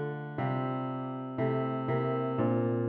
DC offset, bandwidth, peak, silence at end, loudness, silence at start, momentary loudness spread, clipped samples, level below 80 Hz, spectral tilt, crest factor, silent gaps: under 0.1%; 4.4 kHz; -18 dBFS; 0 s; -32 LUFS; 0 s; 7 LU; under 0.1%; -70 dBFS; -11 dB/octave; 14 dB; none